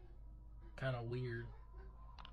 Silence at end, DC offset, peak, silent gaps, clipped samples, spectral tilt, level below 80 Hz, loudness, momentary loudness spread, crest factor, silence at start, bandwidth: 0 s; under 0.1%; -30 dBFS; none; under 0.1%; -8 dB/octave; -56 dBFS; -45 LUFS; 16 LU; 18 dB; 0 s; 7.4 kHz